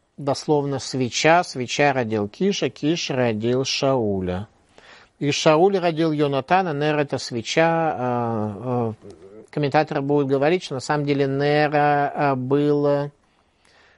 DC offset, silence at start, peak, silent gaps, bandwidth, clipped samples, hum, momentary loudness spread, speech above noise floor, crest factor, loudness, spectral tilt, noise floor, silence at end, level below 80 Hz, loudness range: under 0.1%; 0.2 s; -2 dBFS; none; 11.5 kHz; under 0.1%; none; 8 LU; 40 dB; 20 dB; -21 LUFS; -5.5 dB/octave; -61 dBFS; 0.85 s; -60 dBFS; 3 LU